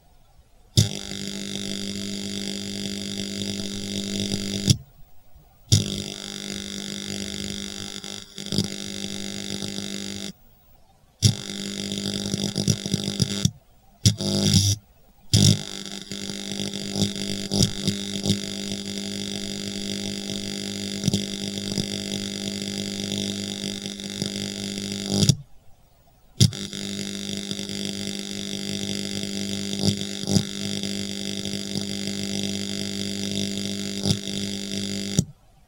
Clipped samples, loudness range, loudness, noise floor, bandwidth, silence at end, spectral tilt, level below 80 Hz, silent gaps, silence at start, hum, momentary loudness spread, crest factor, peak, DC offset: under 0.1%; 6 LU; -26 LUFS; -56 dBFS; 17 kHz; 0.35 s; -4 dB/octave; -50 dBFS; none; 0.4 s; none; 9 LU; 26 dB; 0 dBFS; under 0.1%